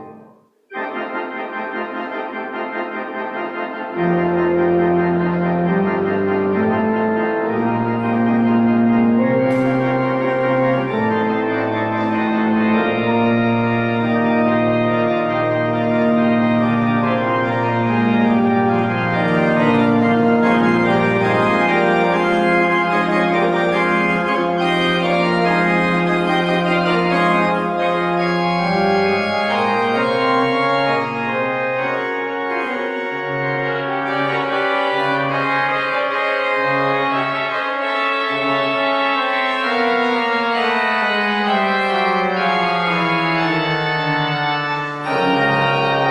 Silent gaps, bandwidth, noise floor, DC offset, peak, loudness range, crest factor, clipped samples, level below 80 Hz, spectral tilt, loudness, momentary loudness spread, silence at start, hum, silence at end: none; 10 kHz; -48 dBFS; under 0.1%; -4 dBFS; 4 LU; 14 dB; under 0.1%; -52 dBFS; -7 dB/octave; -17 LUFS; 6 LU; 0 s; none; 0 s